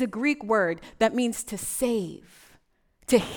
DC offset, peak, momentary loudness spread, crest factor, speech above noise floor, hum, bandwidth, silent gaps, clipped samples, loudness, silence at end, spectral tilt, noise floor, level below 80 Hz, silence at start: under 0.1%; -8 dBFS; 11 LU; 20 dB; 38 dB; none; over 20 kHz; none; under 0.1%; -26 LUFS; 0 s; -4 dB/octave; -64 dBFS; -56 dBFS; 0 s